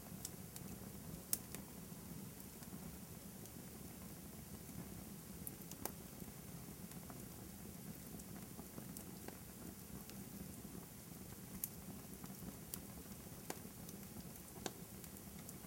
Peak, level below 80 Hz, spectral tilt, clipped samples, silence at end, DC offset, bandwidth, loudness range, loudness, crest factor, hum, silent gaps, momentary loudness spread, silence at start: -16 dBFS; -66 dBFS; -4 dB/octave; under 0.1%; 0 s; under 0.1%; 17 kHz; 3 LU; -51 LUFS; 36 dB; none; none; 5 LU; 0 s